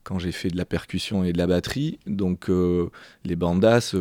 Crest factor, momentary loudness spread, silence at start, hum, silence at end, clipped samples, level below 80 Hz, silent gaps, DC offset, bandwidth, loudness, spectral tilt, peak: 16 dB; 10 LU; 0.05 s; none; 0 s; under 0.1%; -46 dBFS; none; under 0.1%; 16 kHz; -24 LUFS; -6.5 dB/octave; -6 dBFS